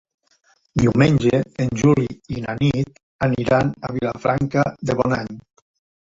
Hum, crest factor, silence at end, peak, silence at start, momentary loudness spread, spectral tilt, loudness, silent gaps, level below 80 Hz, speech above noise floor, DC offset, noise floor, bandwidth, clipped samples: none; 18 dB; 0.65 s; -2 dBFS; 0.75 s; 12 LU; -7 dB/octave; -20 LUFS; 3.03-3.19 s; -44 dBFS; 42 dB; under 0.1%; -61 dBFS; 7.8 kHz; under 0.1%